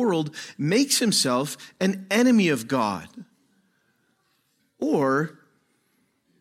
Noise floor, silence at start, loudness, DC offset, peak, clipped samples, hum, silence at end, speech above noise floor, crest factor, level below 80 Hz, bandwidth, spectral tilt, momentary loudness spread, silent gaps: -69 dBFS; 0 s; -23 LUFS; under 0.1%; -8 dBFS; under 0.1%; none; 1.1 s; 46 dB; 18 dB; -72 dBFS; 16 kHz; -4 dB/octave; 13 LU; none